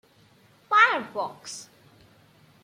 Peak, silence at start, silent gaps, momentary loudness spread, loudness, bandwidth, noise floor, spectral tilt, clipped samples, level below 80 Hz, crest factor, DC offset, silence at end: -6 dBFS; 0.7 s; none; 20 LU; -22 LUFS; 15 kHz; -58 dBFS; -1.5 dB/octave; under 0.1%; -76 dBFS; 22 dB; under 0.1%; 1 s